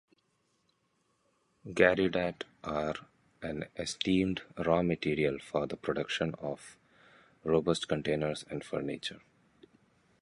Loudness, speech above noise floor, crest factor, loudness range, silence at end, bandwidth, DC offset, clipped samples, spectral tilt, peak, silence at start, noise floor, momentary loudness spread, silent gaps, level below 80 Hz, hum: -33 LUFS; 44 dB; 24 dB; 3 LU; 1.05 s; 11.5 kHz; under 0.1%; under 0.1%; -5.5 dB/octave; -10 dBFS; 1.65 s; -75 dBFS; 13 LU; none; -60 dBFS; none